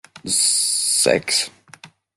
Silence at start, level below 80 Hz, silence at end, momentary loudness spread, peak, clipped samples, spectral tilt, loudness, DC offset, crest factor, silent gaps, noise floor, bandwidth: 0.15 s; -62 dBFS; 0.3 s; 6 LU; -2 dBFS; under 0.1%; -0.5 dB/octave; -17 LUFS; under 0.1%; 18 dB; none; -46 dBFS; 12.5 kHz